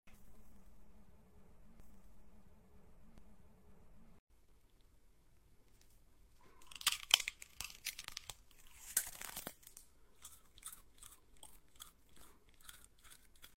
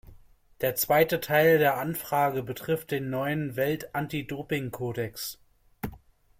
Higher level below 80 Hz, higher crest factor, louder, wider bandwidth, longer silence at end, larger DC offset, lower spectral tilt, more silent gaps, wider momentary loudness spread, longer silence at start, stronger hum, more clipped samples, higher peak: second, -66 dBFS vs -56 dBFS; first, 40 dB vs 20 dB; second, -40 LUFS vs -27 LUFS; about the same, 16 kHz vs 16.5 kHz; second, 0 s vs 0.4 s; neither; second, 1 dB/octave vs -5 dB/octave; first, 4.19-4.27 s vs none; first, 27 LU vs 14 LU; about the same, 0.05 s vs 0.1 s; neither; neither; about the same, -10 dBFS vs -8 dBFS